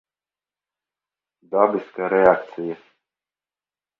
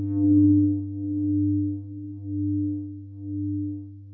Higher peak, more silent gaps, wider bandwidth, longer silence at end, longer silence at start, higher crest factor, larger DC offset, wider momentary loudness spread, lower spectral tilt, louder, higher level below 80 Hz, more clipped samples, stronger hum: first, 0 dBFS vs -10 dBFS; neither; first, 5.4 kHz vs 1.2 kHz; first, 1.25 s vs 0 s; first, 1.5 s vs 0 s; first, 24 dB vs 14 dB; neither; second, 15 LU vs 18 LU; second, -8.5 dB/octave vs -16 dB/octave; first, -20 LUFS vs -25 LUFS; second, -64 dBFS vs -46 dBFS; neither; first, 50 Hz at -60 dBFS vs none